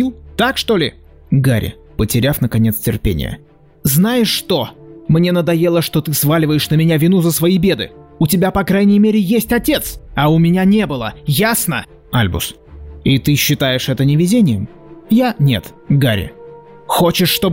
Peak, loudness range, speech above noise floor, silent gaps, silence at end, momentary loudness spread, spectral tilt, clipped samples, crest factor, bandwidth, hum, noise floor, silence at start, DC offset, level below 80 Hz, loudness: -4 dBFS; 3 LU; 23 dB; none; 0 s; 9 LU; -5.5 dB/octave; under 0.1%; 10 dB; 16.5 kHz; none; -37 dBFS; 0 s; under 0.1%; -36 dBFS; -15 LUFS